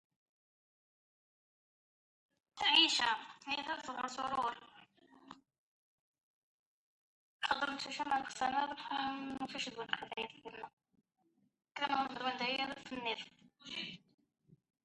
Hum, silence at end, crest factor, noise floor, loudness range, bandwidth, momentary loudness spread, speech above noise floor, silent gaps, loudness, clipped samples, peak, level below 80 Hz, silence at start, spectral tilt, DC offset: none; 0.85 s; 24 dB; -70 dBFS; 10 LU; 11 kHz; 19 LU; 32 dB; 5.58-6.14 s, 6.23-7.39 s, 10.73-10.77 s; -37 LUFS; under 0.1%; -16 dBFS; -78 dBFS; 2.55 s; -1.5 dB/octave; under 0.1%